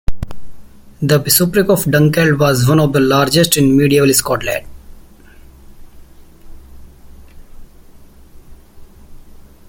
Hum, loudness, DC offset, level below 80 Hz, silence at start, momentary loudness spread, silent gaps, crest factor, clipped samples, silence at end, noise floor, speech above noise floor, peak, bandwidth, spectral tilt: none; -12 LUFS; under 0.1%; -34 dBFS; 0.1 s; 11 LU; none; 16 dB; under 0.1%; 0.3 s; -40 dBFS; 28 dB; 0 dBFS; 17 kHz; -4.5 dB/octave